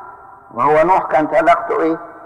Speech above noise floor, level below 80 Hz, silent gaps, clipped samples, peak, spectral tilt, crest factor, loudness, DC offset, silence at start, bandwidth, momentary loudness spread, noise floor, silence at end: 24 dB; -46 dBFS; none; under 0.1%; -4 dBFS; -6.5 dB/octave; 12 dB; -14 LUFS; under 0.1%; 0 s; 10.5 kHz; 6 LU; -38 dBFS; 0 s